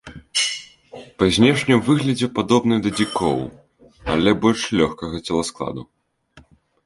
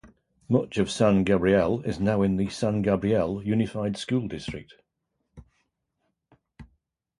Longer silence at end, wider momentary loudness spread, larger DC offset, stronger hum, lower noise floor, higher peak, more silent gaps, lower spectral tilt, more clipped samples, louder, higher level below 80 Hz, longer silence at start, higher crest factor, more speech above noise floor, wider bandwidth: about the same, 0.45 s vs 0.55 s; first, 15 LU vs 8 LU; neither; neither; second, -52 dBFS vs -79 dBFS; first, -2 dBFS vs -8 dBFS; neither; second, -5 dB/octave vs -7 dB/octave; neither; first, -19 LUFS vs -25 LUFS; about the same, -46 dBFS vs -50 dBFS; about the same, 0.05 s vs 0.05 s; about the same, 20 dB vs 18 dB; second, 33 dB vs 54 dB; about the same, 11.5 kHz vs 11.5 kHz